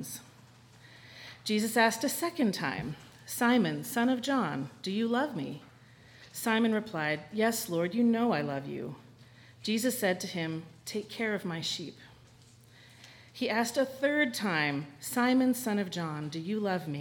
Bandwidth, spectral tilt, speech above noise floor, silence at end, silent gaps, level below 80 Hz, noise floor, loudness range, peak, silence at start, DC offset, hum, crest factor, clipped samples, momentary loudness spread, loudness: 19 kHz; -4.5 dB/octave; 27 dB; 0 s; none; -70 dBFS; -57 dBFS; 4 LU; -10 dBFS; 0 s; under 0.1%; none; 22 dB; under 0.1%; 14 LU; -31 LUFS